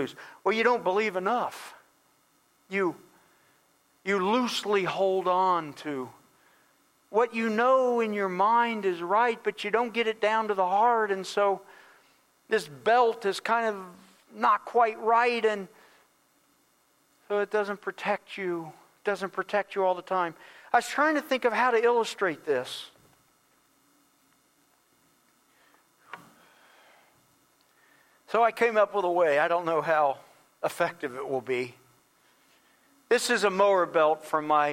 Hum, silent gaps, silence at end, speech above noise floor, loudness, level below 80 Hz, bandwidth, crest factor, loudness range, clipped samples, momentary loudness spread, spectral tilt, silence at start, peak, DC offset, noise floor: none; none; 0 s; 41 dB; -27 LUFS; -78 dBFS; 16.5 kHz; 20 dB; 7 LU; under 0.1%; 12 LU; -4 dB/octave; 0 s; -8 dBFS; under 0.1%; -67 dBFS